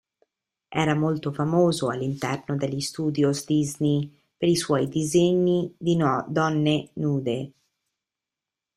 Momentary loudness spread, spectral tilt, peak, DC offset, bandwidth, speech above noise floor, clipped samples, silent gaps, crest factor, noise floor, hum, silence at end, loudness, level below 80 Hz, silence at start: 7 LU; -6 dB/octave; -6 dBFS; under 0.1%; 14.5 kHz; 65 dB; under 0.1%; none; 18 dB; -88 dBFS; none; 1.25 s; -24 LUFS; -60 dBFS; 0.7 s